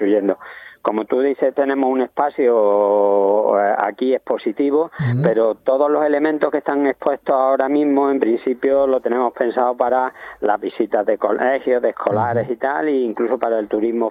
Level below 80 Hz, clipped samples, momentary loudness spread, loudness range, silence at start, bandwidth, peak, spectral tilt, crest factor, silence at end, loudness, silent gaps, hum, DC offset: -62 dBFS; under 0.1%; 5 LU; 2 LU; 0 s; 4.8 kHz; -2 dBFS; -10 dB/octave; 16 dB; 0 s; -18 LUFS; none; none; under 0.1%